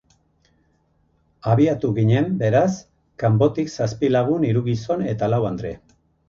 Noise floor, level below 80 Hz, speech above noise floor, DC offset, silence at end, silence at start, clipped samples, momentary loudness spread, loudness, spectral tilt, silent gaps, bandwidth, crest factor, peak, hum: -63 dBFS; -50 dBFS; 44 dB; under 0.1%; 0.5 s; 1.45 s; under 0.1%; 10 LU; -20 LUFS; -8 dB/octave; none; 7.2 kHz; 16 dB; -4 dBFS; none